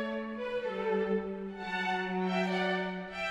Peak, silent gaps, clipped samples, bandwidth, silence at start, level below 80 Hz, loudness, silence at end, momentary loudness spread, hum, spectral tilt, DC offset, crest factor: -20 dBFS; none; under 0.1%; 9.4 kHz; 0 s; -64 dBFS; -33 LUFS; 0 s; 6 LU; none; -6.5 dB/octave; under 0.1%; 14 dB